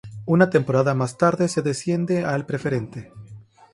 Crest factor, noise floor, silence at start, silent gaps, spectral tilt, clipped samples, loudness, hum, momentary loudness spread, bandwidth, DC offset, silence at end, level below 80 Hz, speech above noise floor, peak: 18 dB; -45 dBFS; 0.05 s; none; -6.5 dB/octave; under 0.1%; -21 LUFS; none; 10 LU; 11.5 kHz; under 0.1%; 0.3 s; -58 dBFS; 24 dB; -4 dBFS